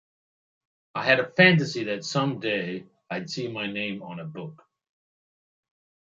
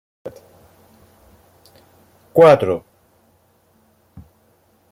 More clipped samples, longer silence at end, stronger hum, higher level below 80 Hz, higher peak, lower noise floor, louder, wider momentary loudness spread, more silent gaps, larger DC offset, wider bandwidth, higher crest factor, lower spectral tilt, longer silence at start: neither; second, 1.55 s vs 2.15 s; neither; second, -72 dBFS vs -58 dBFS; about the same, -4 dBFS vs -2 dBFS; first, under -90 dBFS vs -58 dBFS; second, -24 LUFS vs -14 LUFS; second, 20 LU vs 27 LU; neither; neither; second, 7.8 kHz vs 15 kHz; about the same, 24 dB vs 20 dB; second, -5.5 dB/octave vs -7 dB/octave; first, 0.95 s vs 0.25 s